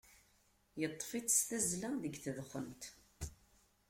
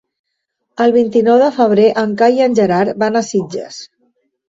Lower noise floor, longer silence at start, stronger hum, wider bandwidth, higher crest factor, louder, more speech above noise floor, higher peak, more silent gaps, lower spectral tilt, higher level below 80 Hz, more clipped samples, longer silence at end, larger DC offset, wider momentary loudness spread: about the same, -73 dBFS vs -72 dBFS; second, 0.05 s vs 0.8 s; neither; first, 16.5 kHz vs 7.8 kHz; first, 22 dB vs 12 dB; second, -38 LUFS vs -13 LUFS; second, 33 dB vs 59 dB; second, -20 dBFS vs -2 dBFS; neither; second, -3 dB/octave vs -6 dB/octave; about the same, -64 dBFS vs -60 dBFS; neither; about the same, 0.55 s vs 0.65 s; neither; first, 18 LU vs 15 LU